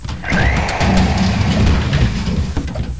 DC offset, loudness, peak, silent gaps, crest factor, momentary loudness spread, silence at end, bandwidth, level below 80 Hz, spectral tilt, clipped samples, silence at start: 2%; -16 LUFS; -2 dBFS; none; 14 dB; 6 LU; 0 s; 8 kHz; -20 dBFS; -6 dB/octave; under 0.1%; 0 s